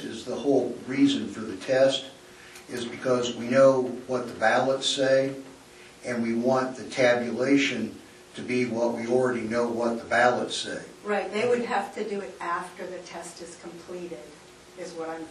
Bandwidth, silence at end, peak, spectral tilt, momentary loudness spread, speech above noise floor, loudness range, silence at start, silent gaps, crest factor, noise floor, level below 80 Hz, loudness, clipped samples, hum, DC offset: 12.5 kHz; 0 s; -8 dBFS; -4.5 dB/octave; 17 LU; 23 dB; 6 LU; 0 s; none; 20 dB; -49 dBFS; -66 dBFS; -26 LUFS; under 0.1%; none; under 0.1%